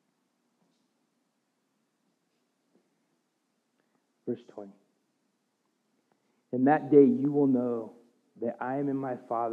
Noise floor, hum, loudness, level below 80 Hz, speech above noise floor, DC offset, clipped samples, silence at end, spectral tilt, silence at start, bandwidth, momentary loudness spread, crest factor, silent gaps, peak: -77 dBFS; none; -27 LUFS; under -90 dBFS; 51 dB; under 0.1%; under 0.1%; 0 s; -10.5 dB/octave; 4.25 s; 3.9 kHz; 21 LU; 24 dB; none; -8 dBFS